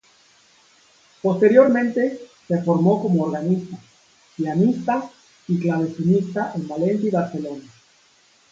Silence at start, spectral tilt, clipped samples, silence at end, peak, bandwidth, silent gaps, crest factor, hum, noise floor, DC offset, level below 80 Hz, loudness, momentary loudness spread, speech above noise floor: 1.25 s; -8.5 dB/octave; under 0.1%; 0.9 s; -2 dBFS; 7.6 kHz; none; 20 dB; none; -57 dBFS; under 0.1%; -66 dBFS; -20 LUFS; 17 LU; 37 dB